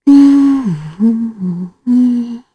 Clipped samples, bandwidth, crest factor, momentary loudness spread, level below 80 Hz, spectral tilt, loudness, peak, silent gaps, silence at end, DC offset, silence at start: under 0.1%; 8.4 kHz; 12 dB; 14 LU; -50 dBFS; -8 dB/octave; -12 LUFS; 0 dBFS; none; 0.15 s; under 0.1%; 0.05 s